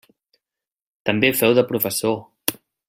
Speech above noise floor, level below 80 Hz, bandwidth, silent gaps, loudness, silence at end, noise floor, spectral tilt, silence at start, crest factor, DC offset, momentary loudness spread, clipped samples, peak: 70 dB; -62 dBFS; 16.5 kHz; none; -20 LUFS; 0.35 s; -88 dBFS; -4 dB/octave; 1.05 s; 22 dB; under 0.1%; 10 LU; under 0.1%; 0 dBFS